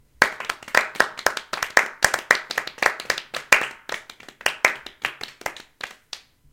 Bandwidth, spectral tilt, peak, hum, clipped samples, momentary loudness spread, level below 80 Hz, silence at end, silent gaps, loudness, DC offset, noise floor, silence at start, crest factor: 17 kHz; -0.5 dB/octave; 0 dBFS; none; under 0.1%; 17 LU; -56 dBFS; 0.35 s; none; -22 LUFS; under 0.1%; -43 dBFS; 0.2 s; 24 dB